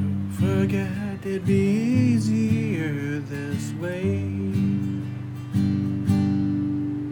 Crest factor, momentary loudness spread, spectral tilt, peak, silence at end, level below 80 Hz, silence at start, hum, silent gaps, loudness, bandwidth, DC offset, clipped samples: 16 dB; 8 LU; -8 dB/octave; -8 dBFS; 0 s; -58 dBFS; 0 s; none; none; -24 LUFS; 18 kHz; under 0.1%; under 0.1%